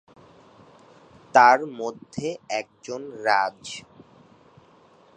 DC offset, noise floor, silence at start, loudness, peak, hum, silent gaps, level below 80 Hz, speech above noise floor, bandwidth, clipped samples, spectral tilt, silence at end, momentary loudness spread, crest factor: under 0.1%; -55 dBFS; 1.35 s; -22 LUFS; -2 dBFS; none; none; -68 dBFS; 32 dB; 10 kHz; under 0.1%; -3.5 dB/octave; 1.35 s; 20 LU; 24 dB